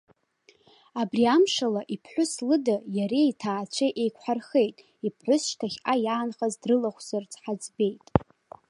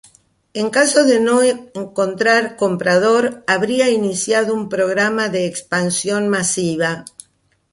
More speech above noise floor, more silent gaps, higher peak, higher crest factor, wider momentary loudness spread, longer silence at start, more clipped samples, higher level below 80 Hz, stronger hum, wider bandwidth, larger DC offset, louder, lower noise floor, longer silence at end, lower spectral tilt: second, 36 dB vs 44 dB; neither; about the same, -2 dBFS vs -2 dBFS; first, 26 dB vs 16 dB; about the same, 10 LU vs 8 LU; first, 0.95 s vs 0.55 s; neither; first, -54 dBFS vs -60 dBFS; neither; about the same, 11.5 kHz vs 11.5 kHz; neither; second, -27 LUFS vs -16 LUFS; about the same, -62 dBFS vs -60 dBFS; second, 0.5 s vs 0.7 s; first, -5 dB/octave vs -3.5 dB/octave